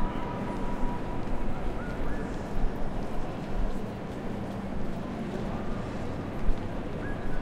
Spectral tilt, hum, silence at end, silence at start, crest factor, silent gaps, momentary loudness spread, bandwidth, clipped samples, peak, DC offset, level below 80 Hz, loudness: -7.5 dB/octave; none; 0 s; 0 s; 18 dB; none; 2 LU; 8.2 kHz; under 0.1%; -10 dBFS; under 0.1%; -34 dBFS; -35 LUFS